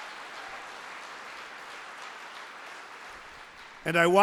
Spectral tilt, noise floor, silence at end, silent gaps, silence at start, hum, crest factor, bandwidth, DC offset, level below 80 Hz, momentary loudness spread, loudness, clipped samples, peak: -4.5 dB/octave; -48 dBFS; 0 s; none; 0 s; none; 24 dB; 16 kHz; under 0.1%; -70 dBFS; 16 LU; -35 LUFS; under 0.1%; -8 dBFS